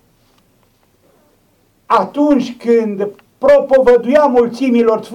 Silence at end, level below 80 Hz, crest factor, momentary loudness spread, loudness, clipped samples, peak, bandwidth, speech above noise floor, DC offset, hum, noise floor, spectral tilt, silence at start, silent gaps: 0 s; -48 dBFS; 12 dB; 7 LU; -13 LUFS; under 0.1%; -2 dBFS; 11 kHz; 44 dB; under 0.1%; none; -56 dBFS; -6.5 dB/octave; 1.9 s; none